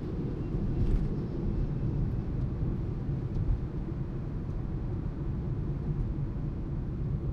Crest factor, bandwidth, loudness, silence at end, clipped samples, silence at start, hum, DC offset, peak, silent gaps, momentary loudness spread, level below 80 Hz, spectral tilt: 16 dB; 5.6 kHz; -34 LUFS; 0 s; under 0.1%; 0 s; none; under 0.1%; -16 dBFS; none; 4 LU; -36 dBFS; -10.5 dB/octave